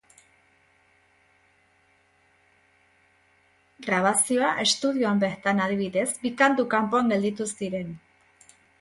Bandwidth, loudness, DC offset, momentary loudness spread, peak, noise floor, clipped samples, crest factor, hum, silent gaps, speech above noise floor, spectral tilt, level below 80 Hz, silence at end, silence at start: 12 kHz; -24 LUFS; under 0.1%; 10 LU; -6 dBFS; -64 dBFS; under 0.1%; 22 dB; none; none; 40 dB; -3.5 dB/octave; -68 dBFS; 0.85 s; 3.8 s